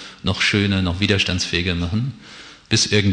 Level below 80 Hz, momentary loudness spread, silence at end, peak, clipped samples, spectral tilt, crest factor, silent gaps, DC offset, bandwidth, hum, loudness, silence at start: -42 dBFS; 15 LU; 0 s; -2 dBFS; under 0.1%; -4 dB/octave; 18 dB; none; under 0.1%; 10 kHz; none; -19 LUFS; 0 s